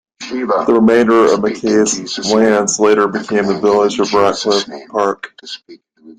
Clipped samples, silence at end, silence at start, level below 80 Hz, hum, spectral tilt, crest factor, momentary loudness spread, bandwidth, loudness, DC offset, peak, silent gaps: under 0.1%; 0.05 s; 0.2 s; -54 dBFS; none; -4 dB/octave; 14 dB; 13 LU; 9.6 kHz; -13 LUFS; under 0.1%; 0 dBFS; none